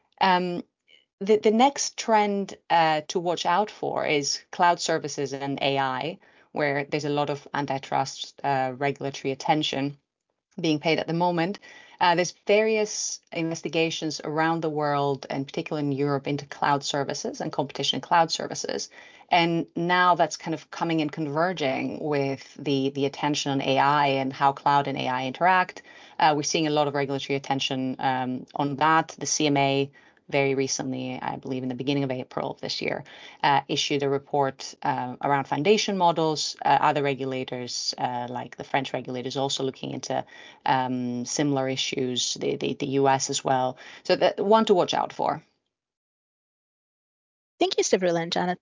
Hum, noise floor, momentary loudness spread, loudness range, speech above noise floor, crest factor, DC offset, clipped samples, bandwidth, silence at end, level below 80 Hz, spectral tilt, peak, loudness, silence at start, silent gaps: none; -80 dBFS; 10 LU; 4 LU; 54 dB; 18 dB; under 0.1%; under 0.1%; 7.6 kHz; 0.05 s; -72 dBFS; -4 dB/octave; -6 dBFS; -25 LUFS; 0.2 s; 1.13-1.18 s, 45.97-47.58 s